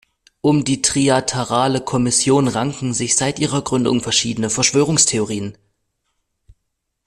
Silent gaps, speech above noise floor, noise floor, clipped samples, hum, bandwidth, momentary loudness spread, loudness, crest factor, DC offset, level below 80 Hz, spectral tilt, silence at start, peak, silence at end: none; 57 dB; -74 dBFS; under 0.1%; none; 13 kHz; 7 LU; -17 LUFS; 18 dB; under 0.1%; -50 dBFS; -3.5 dB/octave; 0.45 s; 0 dBFS; 1.55 s